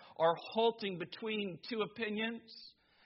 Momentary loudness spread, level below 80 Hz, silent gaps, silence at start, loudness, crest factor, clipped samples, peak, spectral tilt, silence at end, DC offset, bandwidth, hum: 17 LU; -82 dBFS; none; 0 s; -37 LUFS; 20 dB; under 0.1%; -18 dBFS; -2.5 dB/octave; 0.35 s; under 0.1%; 5.8 kHz; none